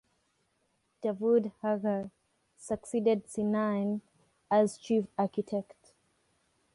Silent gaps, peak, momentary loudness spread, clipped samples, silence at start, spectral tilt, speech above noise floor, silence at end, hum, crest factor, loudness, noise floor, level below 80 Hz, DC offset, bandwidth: none; -14 dBFS; 10 LU; under 0.1%; 1.05 s; -6.5 dB/octave; 46 dB; 1.1 s; none; 18 dB; -31 LUFS; -76 dBFS; -72 dBFS; under 0.1%; 11.5 kHz